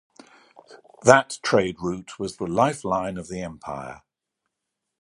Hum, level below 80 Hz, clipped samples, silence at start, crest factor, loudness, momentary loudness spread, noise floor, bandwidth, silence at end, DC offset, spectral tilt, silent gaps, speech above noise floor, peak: none; -56 dBFS; under 0.1%; 0.7 s; 24 dB; -23 LUFS; 17 LU; -82 dBFS; 11.5 kHz; 1.05 s; under 0.1%; -4.5 dB/octave; none; 59 dB; 0 dBFS